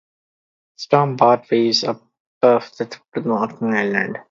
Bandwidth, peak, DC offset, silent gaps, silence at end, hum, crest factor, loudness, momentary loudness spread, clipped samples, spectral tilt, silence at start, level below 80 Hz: 7.6 kHz; 0 dBFS; under 0.1%; 2.20-2.41 s; 0.1 s; none; 20 dB; -18 LUFS; 13 LU; under 0.1%; -5.5 dB/octave; 0.8 s; -66 dBFS